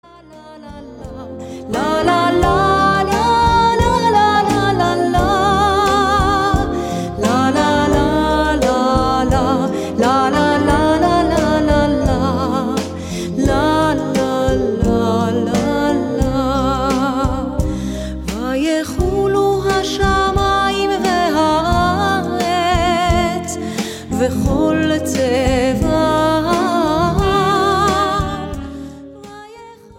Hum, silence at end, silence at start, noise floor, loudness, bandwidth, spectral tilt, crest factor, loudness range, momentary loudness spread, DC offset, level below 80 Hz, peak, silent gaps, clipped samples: none; 0.25 s; 0.3 s; -39 dBFS; -15 LUFS; 16.5 kHz; -5.5 dB/octave; 16 dB; 4 LU; 9 LU; under 0.1%; -28 dBFS; 0 dBFS; none; under 0.1%